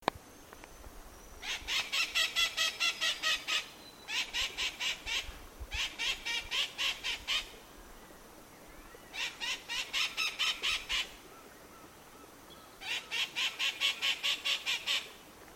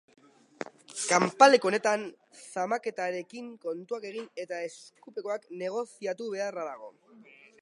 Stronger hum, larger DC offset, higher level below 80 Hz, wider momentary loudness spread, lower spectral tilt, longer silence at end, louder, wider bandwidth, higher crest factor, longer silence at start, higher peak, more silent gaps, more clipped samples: neither; neither; first, -56 dBFS vs -84 dBFS; about the same, 23 LU vs 22 LU; second, 0.5 dB/octave vs -3 dB/octave; second, 0 s vs 0.7 s; second, -32 LUFS vs -29 LUFS; first, 16.5 kHz vs 11.5 kHz; about the same, 26 dB vs 26 dB; second, 0 s vs 0.95 s; second, -10 dBFS vs -4 dBFS; neither; neither